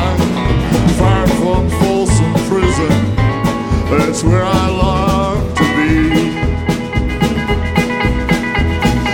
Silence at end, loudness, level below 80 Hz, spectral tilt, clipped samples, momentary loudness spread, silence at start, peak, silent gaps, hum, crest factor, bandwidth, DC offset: 0 s; -14 LUFS; -22 dBFS; -6 dB/octave; under 0.1%; 4 LU; 0 s; 0 dBFS; none; none; 12 dB; 18 kHz; under 0.1%